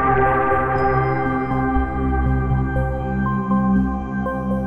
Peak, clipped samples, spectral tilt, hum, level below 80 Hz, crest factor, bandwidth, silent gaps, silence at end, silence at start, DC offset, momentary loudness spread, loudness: -4 dBFS; under 0.1%; -10 dB/octave; none; -28 dBFS; 14 dB; 5.4 kHz; none; 0 s; 0 s; under 0.1%; 6 LU; -20 LUFS